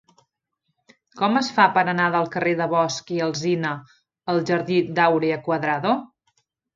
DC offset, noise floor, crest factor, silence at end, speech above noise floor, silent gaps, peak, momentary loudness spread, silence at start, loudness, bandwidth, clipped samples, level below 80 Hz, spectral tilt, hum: under 0.1%; -77 dBFS; 22 dB; 0.7 s; 55 dB; none; 0 dBFS; 8 LU; 1.15 s; -21 LUFS; 7.6 kHz; under 0.1%; -68 dBFS; -5.5 dB/octave; none